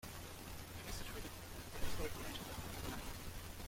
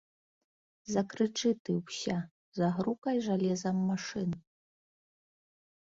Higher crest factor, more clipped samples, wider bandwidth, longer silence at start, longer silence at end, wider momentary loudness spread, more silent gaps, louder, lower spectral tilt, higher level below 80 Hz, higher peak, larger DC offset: about the same, 20 dB vs 18 dB; neither; first, 16.5 kHz vs 7.8 kHz; second, 0 s vs 0.85 s; second, 0 s vs 1.45 s; about the same, 6 LU vs 7 LU; second, none vs 1.60-1.65 s, 2.31-2.52 s, 2.98-3.02 s; second, -48 LUFS vs -33 LUFS; second, -3.5 dB/octave vs -6 dB/octave; first, -52 dBFS vs -70 dBFS; second, -26 dBFS vs -16 dBFS; neither